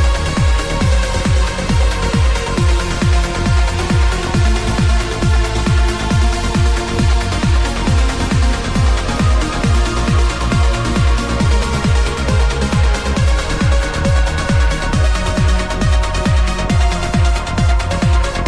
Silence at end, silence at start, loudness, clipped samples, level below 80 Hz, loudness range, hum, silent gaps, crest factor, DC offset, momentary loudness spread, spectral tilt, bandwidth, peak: 0 s; 0 s; -16 LUFS; under 0.1%; -16 dBFS; 0 LU; none; none; 10 dB; under 0.1%; 1 LU; -5.5 dB/octave; 11 kHz; -2 dBFS